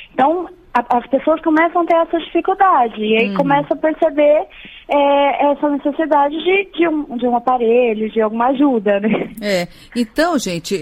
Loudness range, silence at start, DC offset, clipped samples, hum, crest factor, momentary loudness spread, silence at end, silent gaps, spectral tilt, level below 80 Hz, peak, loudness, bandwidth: 2 LU; 0 s; under 0.1%; under 0.1%; none; 14 dB; 6 LU; 0 s; none; -5.5 dB/octave; -50 dBFS; -2 dBFS; -16 LUFS; 16 kHz